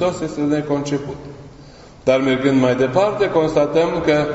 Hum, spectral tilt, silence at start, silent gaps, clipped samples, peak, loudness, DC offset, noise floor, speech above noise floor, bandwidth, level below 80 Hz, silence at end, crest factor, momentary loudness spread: none; -6.5 dB/octave; 0 s; none; under 0.1%; -2 dBFS; -18 LUFS; under 0.1%; -41 dBFS; 24 dB; 8 kHz; -46 dBFS; 0 s; 16 dB; 9 LU